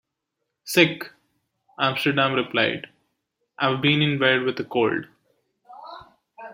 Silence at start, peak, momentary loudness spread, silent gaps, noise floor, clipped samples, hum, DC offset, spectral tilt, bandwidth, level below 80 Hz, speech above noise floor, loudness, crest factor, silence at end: 0.65 s; -2 dBFS; 22 LU; none; -80 dBFS; under 0.1%; none; under 0.1%; -5 dB/octave; 16.5 kHz; -66 dBFS; 59 dB; -21 LUFS; 22 dB; 0 s